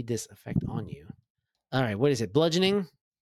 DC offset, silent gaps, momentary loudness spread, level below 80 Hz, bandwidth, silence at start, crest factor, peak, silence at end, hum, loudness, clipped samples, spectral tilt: under 0.1%; 1.30-1.35 s; 16 LU; -56 dBFS; 14 kHz; 0 s; 18 dB; -10 dBFS; 0.35 s; none; -28 LUFS; under 0.1%; -5.5 dB/octave